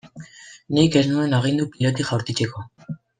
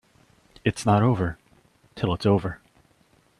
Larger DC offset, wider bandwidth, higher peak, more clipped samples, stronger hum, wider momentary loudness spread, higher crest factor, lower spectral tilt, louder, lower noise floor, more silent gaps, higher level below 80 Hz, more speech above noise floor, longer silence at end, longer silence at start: neither; second, 9.6 kHz vs 12 kHz; about the same, -4 dBFS vs -6 dBFS; neither; neither; first, 21 LU vs 15 LU; about the same, 18 dB vs 20 dB; about the same, -6 dB/octave vs -7 dB/octave; first, -21 LUFS vs -24 LUFS; second, -43 dBFS vs -61 dBFS; neither; second, -56 dBFS vs -50 dBFS; second, 23 dB vs 39 dB; second, 0.25 s vs 0.85 s; second, 0.05 s vs 0.65 s